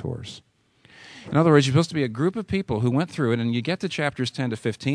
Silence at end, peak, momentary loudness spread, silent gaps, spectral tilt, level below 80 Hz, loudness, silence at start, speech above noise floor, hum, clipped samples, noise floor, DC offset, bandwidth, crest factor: 0 s; -4 dBFS; 10 LU; none; -6.5 dB/octave; -56 dBFS; -23 LUFS; 0 s; 32 dB; none; under 0.1%; -55 dBFS; under 0.1%; 11 kHz; 20 dB